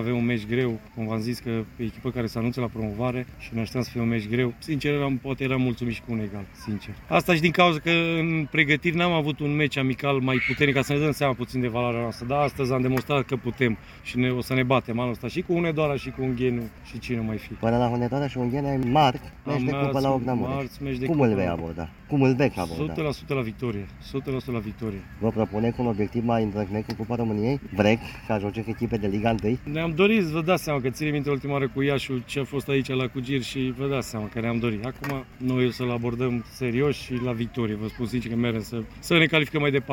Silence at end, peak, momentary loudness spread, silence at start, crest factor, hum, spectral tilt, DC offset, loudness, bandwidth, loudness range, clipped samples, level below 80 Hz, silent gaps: 0 s; -4 dBFS; 10 LU; 0 s; 22 dB; none; -6.5 dB/octave; under 0.1%; -26 LUFS; 17 kHz; 5 LU; under 0.1%; -48 dBFS; none